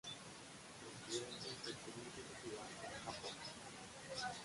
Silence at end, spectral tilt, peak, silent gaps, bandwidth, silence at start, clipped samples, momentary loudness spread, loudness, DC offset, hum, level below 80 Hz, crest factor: 0 s; -2.5 dB/octave; -30 dBFS; none; 11.5 kHz; 0.05 s; under 0.1%; 8 LU; -49 LUFS; under 0.1%; none; -74 dBFS; 20 dB